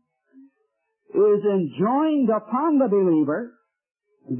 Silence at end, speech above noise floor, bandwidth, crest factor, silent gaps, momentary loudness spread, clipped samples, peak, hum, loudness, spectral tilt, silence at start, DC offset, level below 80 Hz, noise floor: 0 s; 53 dB; 3.3 kHz; 12 dB; none; 8 LU; under 0.1%; -10 dBFS; none; -21 LUFS; -12.5 dB/octave; 1.15 s; under 0.1%; -78 dBFS; -73 dBFS